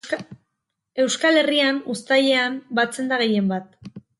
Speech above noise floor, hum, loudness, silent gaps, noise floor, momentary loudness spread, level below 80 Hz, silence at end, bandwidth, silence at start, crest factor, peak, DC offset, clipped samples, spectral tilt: 58 dB; none; -20 LUFS; none; -79 dBFS; 12 LU; -68 dBFS; 0.2 s; 11.5 kHz; 0.05 s; 16 dB; -6 dBFS; under 0.1%; under 0.1%; -3.5 dB/octave